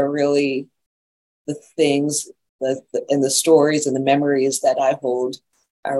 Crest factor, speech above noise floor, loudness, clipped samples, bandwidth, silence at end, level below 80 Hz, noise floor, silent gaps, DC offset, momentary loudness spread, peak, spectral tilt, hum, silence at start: 18 dB; over 71 dB; -19 LUFS; under 0.1%; 13 kHz; 0 s; -72 dBFS; under -90 dBFS; 0.86-1.45 s, 2.49-2.59 s, 5.70-5.83 s; under 0.1%; 16 LU; -2 dBFS; -4 dB/octave; none; 0 s